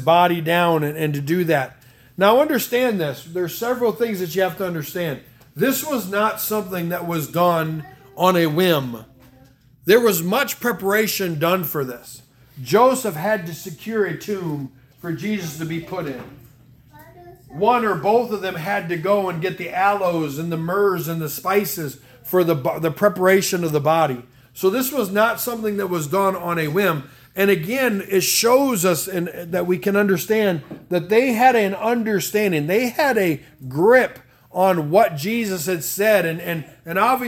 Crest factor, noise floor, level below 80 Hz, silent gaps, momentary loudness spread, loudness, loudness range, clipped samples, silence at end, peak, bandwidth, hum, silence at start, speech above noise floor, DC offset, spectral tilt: 18 dB; -51 dBFS; -60 dBFS; none; 12 LU; -20 LUFS; 4 LU; under 0.1%; 0 s; -2 dBFS; 18 kHz; none; 0 s; 31 dB; under 0.1%; -4.5 dB/octave